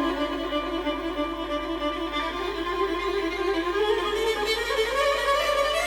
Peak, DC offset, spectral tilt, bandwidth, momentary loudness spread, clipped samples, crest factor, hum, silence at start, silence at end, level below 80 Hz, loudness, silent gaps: -12 dBFS; under 0.1%; -3 dB/octave; over 20 kHz; 6 LU; under 0.1%; 14 dB; none; 0 s; 0 s; -44 dBFS; -26 LUFS; none